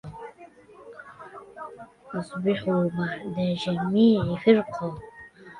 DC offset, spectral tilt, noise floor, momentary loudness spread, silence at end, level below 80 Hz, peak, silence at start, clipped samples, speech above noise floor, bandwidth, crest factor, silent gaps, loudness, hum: under 0.1%; -8 dB/octave; -50 dBFS; 24 LU; 0 s; -58 dBFS; -6 dBFS; 0.05 s; under 0.1%; 26 dB; 10 kHz; 20 dB; none; -25 LUFS; none